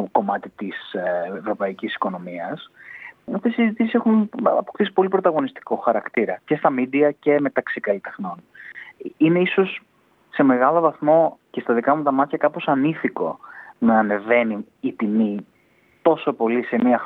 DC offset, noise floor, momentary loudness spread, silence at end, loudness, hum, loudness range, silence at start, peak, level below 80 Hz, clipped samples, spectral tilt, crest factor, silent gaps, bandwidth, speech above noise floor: under 0.1%; -59 dBFS; 14 LU; 0 s; -21 LUFS; none; 4 LU; 0 s; -4 dBFS; -72 dBFS; under 0.1%; -9.5 dB/octave; 18 dB; none; 4.2 kHz; 38 dB